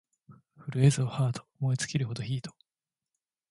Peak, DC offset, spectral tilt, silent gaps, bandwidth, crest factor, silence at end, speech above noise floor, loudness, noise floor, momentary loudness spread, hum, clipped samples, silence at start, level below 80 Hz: -10 dBFS; under 0.1%; -6 dB/octave; none; 11.5 kHz; 20 dB; 1 s; over 62 dB; -30 LUFS; under -90 dBFS; 12 LU; none; under 0.1%; 0.3 s; -64 dBFS